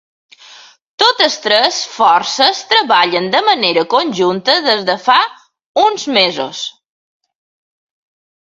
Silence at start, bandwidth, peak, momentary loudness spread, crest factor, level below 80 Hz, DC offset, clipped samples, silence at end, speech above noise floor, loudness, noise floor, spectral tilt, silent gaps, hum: 1 s; 10.5 kHz; 0 dBFS; 6 LU; 14 dB; -62 dBFS; under 0.1%; under 0.1%; 1.8 s; 28 dB; -12 LUFS; -41 dBFS; -2.5 dB/octave; 5.66-5.75 s; none